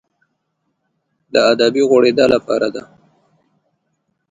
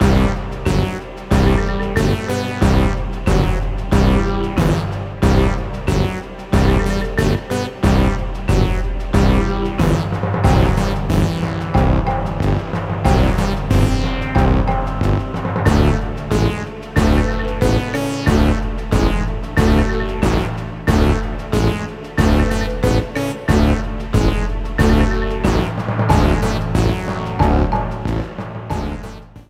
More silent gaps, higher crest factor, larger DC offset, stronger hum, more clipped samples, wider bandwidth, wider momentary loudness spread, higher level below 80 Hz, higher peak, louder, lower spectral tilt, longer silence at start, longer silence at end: neither; about the same, 18 dB vs 16 dB; neither; neither; neither; second, 9.4 kHz vs 15 kHz; about the same, 8 LU vs 7 LU; second, -58 dBFS vs -22 dBFS; about the same, 0 dBFS vs 0 dBFS; first, -14 LUFS vs -18 LUFS; second, -4.5 dB/octave vs -7 dB/octave; first, 1.35 s vs 0 s; first, 1.5 s vs 0.1 s